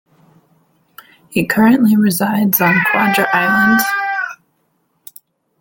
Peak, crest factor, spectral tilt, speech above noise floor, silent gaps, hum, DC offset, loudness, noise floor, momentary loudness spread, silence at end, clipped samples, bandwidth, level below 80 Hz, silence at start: 0 dBFS; 16 dB; -5 dB/octave; 51 dB; none; none; under 0.1%; -13 LUFS; -63 dBFS; 9 LU; 1.25 s; under 0.1%; 17 kHz; -54 dBFS; 1.3 s